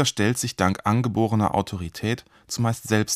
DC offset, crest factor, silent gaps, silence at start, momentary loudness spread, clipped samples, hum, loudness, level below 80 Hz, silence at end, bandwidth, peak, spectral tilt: under 0.1%; 18 dB; none; 0 s; 8 LU; under 0.1%; none; -24 LUFS; -52 dBFS; 0 s; 15.5 kHz; -4 dBFS; -5 dB/octave